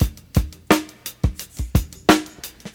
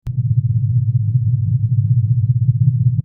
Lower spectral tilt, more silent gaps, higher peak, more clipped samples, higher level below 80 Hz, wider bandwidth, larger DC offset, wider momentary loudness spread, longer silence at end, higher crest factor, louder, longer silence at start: second, -5 dB/octave vs -13.5 dB/octave; neither; first, 0 dBFS vs -4 dBFS; neither; first, -28 dBFS vs -42 dBFS; first, 20 kHz vs 0.5 kHz; neither; first, 15 LU vs 2 LU; about the same, 0.05 s vs 0.05 s; first, 22 dB vs 12 dB; second, -21 LUFS vs -16 LUFS; about the same, 0 s vs 0.05 s